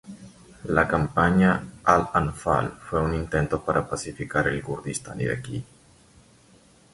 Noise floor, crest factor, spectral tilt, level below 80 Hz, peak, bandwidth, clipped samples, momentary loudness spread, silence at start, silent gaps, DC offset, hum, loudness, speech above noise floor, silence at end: -55 dBFS; 22 dB; -6 dB/octave; -42 dBFS; -2 dBFS; 11.5 kHz; under 0.1%; 12 LU; 0.05 s; none; under 0.1%; none; -24 LUFS; 31 dB; 1.3 s